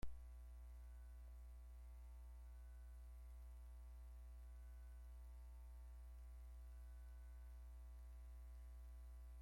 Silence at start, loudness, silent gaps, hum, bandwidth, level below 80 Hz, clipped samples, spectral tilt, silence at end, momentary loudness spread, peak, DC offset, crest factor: 0 s; -61 LUFS; none; 60 Hz at -60 dBFS; 16 kHz; -58 dBFS; under 0.1%; -6 dB/octave; 0 s; 1 LU; -36 dBFS; under 0.1%; 20 dB